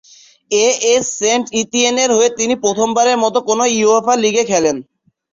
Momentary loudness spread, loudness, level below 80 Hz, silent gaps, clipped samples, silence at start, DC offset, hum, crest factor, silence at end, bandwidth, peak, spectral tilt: 4 LU; -14 LUFS; -58 dBFS; none; under 0.1%; 0.5 s; under 0.1%; none; 14 dB; 0.5 s; 7.8 kHz; -2 dBFS; -2 dB/octave